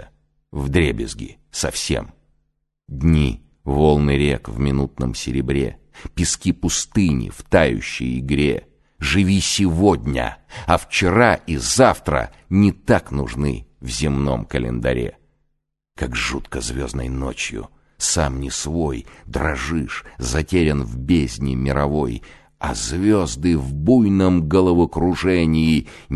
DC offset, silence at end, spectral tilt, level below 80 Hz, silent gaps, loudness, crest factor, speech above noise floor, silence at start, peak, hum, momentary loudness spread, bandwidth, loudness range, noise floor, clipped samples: under 0.1%; 0 s; -5 dB/octave; -30 dBFS; none; -20 LUFS; 18 dB; 53 dB; 0 s; 0 dBFS; none; 11 LU; 12.5 kHz; 6 LU; -72 dBFS; under 0.1%